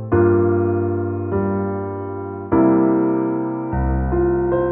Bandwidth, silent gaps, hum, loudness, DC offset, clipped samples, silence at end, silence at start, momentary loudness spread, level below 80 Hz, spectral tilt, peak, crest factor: 2.7 kHz; none; none; -19 LUFS; under 0.1%; under 0.1%; 0 s; 0 s; 10 LU; -32 dBFS; -11.5 dB/octave; -4 dBFS; 14 dB